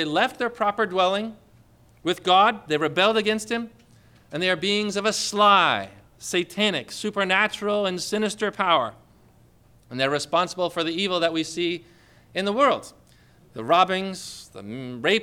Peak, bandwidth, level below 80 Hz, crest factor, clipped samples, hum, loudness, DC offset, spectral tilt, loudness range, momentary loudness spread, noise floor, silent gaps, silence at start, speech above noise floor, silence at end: -6 dBFS; 16.5 kHz; -64 dBFS; 18 dB; under 0.1%; 60 Hz at -60 dBFS; -23 LUFS; under 0.1%; -3.5 dB/octave; 4 LU; 16 LU; -55 dBFS; none; 0 s; 32 dB; 0 s